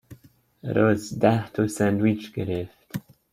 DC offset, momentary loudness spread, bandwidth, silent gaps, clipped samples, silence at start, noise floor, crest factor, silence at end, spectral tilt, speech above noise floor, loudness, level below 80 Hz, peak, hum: under 0.1%; 16 LU; 16 kHz; none; under 0.1%; 0.1 s; -54 dBFS; 20 dB; 0.35 s; -7 dB/octave; 31 dB; -24 LUFS; -58 dBFS; -4 dBFS; none